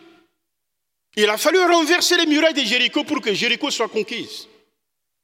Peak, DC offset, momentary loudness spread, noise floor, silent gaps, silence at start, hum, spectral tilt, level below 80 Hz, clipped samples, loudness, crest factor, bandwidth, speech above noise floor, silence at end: -4 dBFS; under 0.1%; 13 LU; -80 dBFS; none; 1.15 s; none; -2 dB/octave; -74 dBFS; under 0.1%; -17 LUFS; 18 dB; 16.5 kHz; 61 dB; 0.8 s